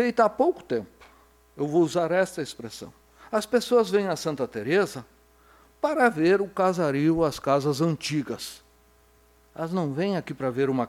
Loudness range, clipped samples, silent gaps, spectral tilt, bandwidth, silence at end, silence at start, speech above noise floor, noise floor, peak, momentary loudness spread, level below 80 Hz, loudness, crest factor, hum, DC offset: 4 LU; under 0.1%; none; -6 dB/octave; 16 kHz; 0 s; 0 s; 35 dB; -59 dBFS; -8 dBFS; 13 LU; -60 dBFS; -25 LUFS; 18 dB; none; under 0.1%